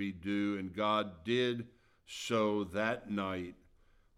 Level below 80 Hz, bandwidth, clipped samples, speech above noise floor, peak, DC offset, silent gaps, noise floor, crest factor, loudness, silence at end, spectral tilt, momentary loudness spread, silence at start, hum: -68 dBFS; 14 kHz; under 0.1%; 31 dB; -18 dBFS; under 0.1%; none; -66 dBFS; 18 dB; -35 LUFS; 0.65 s; -5 dB/octave; 10 LU; 0 s; none